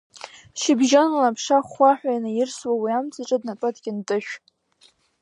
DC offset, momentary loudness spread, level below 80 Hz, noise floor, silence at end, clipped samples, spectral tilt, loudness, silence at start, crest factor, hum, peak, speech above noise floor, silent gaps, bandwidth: under 0.1%; 17 LU; -74 dBFS; -59 dBFS; 0.85 s; under 0.1%; -3.5 dB/octave; -22 LUFS; 0.15 s; 18 dB; none; -4 dBFS; 38 dB; none; 11 kHz